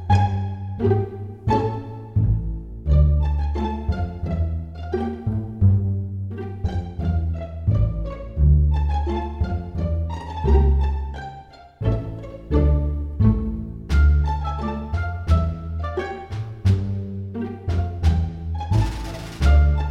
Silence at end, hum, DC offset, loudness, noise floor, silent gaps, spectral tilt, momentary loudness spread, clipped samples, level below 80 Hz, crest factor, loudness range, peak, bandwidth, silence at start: 0 s; none; under 0.1%; -23 LUFS; -42 dBFS; none; -8.5 dB/octave; 12 LU; under 0.1%; -24 dBFS; 18 dB; 3 LU; -4 dBFS; 7 kHz; 0 s